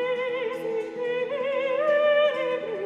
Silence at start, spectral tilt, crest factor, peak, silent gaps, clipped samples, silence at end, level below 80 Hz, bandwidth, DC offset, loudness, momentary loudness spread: 0 s; -4.5 dB/octave; 14 dB; -12 dBFS; none; under 0.1%; 0 s; -74 dBFS; 7.4 kHz; under 0.1%; -25 LUFS; 9 LU